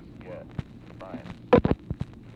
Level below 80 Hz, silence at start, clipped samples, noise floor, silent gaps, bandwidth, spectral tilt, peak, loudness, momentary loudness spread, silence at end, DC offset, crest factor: -42 dBFS; 0.2 s; under 0.1%; -44 dBFS; none; 6.8 kHz; -9 dB/octave; -6 dBFS; -26 LUFS; 20 LU; 0.25 s; under 0.1%; 22 dB